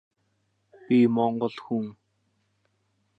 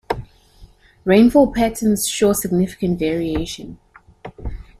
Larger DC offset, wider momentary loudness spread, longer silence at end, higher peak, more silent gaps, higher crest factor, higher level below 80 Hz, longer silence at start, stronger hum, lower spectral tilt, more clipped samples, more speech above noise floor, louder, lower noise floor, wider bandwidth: neither; second, 10 LU vs 21 LU; first, 1.25 s vs 0.2 s; second, -10 dBFS vs -2 dBFS; neither; about the same, 18 dB vs 18 dB; second, -76 dBFS vs -38 dBFS; first, 0.9 s vs 0.1 s; neither; first, -9 dB/octave vs -5 dB/octave; neither; first, 49 dB vs 30 dB; second, -25 LUFS vs -18 LUFS; first, -73 dBFS vs -47 dBFS; second, 5.4 kHz vs 15.5 kHz